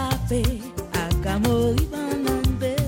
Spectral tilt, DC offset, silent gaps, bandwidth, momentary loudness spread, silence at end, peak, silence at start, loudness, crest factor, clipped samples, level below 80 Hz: -6 dB/octave; under 0.1%; none; 17 kHz; 6 LU; 0 s; -8 dBFS; 0 s; -24 LUFS; 14 dB; under 0.1%; -30 dBFS